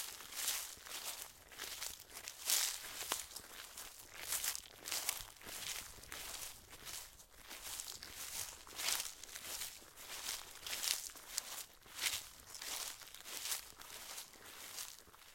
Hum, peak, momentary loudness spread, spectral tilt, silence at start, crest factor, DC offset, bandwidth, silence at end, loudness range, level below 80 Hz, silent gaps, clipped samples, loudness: none; -14 dBFS; 12 LU; 1.5 dB/octave; 0 s; 32 dB; under 0.1%; 17 kHz; 0 s; 5 LU; -70 dBFS; none; under 0.1%; -43 LUFS